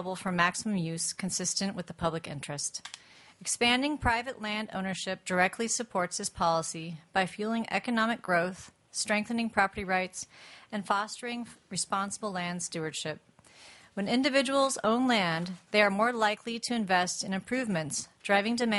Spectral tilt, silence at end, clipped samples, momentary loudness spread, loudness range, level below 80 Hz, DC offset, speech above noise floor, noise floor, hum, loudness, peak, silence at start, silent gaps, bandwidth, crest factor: -3.5 dB/octave; 0 s; under 0.1%; 12 LU; 6 LU; -58 dBFS; under 0.1%; 25 dB; -55 dBFS; none; -30 LUFS; -10 dBFS; 0 s; none; 11.5 kHz; 22 dB